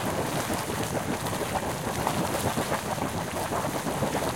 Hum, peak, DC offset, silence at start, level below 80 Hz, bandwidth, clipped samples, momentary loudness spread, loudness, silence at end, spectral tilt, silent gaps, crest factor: none; -10 dBFS; 0.1%; 0 s; -50 dBFS; 17 kHz; under 0.1%; 2 LU; -29 LUFS; 0 s; -4.5 dB/octave; none; 18 dB